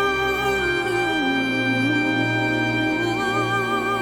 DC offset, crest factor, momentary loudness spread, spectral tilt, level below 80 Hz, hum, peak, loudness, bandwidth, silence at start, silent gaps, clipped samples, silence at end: under 0.1%; 12 dB; 2 LU; -5 dB/octave; -46 dBFS; none; -8 dBFS; -21 LUFS; 18 kHz; 0 s; none; under 0.1%; 0 s